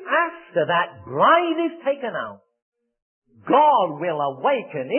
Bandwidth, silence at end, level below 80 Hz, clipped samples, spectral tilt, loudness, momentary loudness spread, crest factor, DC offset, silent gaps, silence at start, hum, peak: 3.4 kHz; 0 s; -72 dBFS; under 0.1%; -9.5 dB/octave; -21 LUFS; 11 LU; 18 dB; under 0.1%; 2.62-2.72 s, 3.02-3.22 s; 0 s; none; -4 dBFS